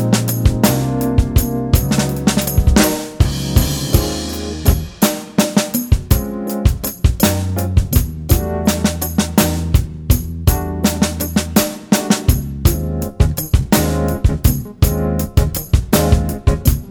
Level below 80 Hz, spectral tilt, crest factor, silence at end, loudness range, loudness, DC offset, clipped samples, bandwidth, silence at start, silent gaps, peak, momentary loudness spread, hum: -20 dBFS; -5.5 dB/octave; 16 dB; 0 s; 1 LU; -16 LUFS; under 0.1%; under 0.1%; over 20 kHz; 0 s; none; 0 dBFS; 4 LU; none